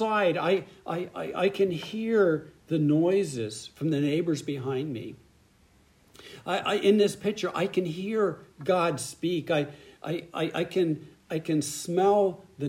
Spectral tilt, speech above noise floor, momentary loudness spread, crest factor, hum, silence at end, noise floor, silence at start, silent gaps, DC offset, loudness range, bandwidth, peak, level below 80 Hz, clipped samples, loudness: -5.5 dB/octave; 34 dB; 12 LU; 18 dB; none; 0 s; -61 dBFS; 0 s; none; under 0.1%; 3 LU; 16 kHz; -10 dBFS; -68 dBFS; under 0.1%; -28 LUFS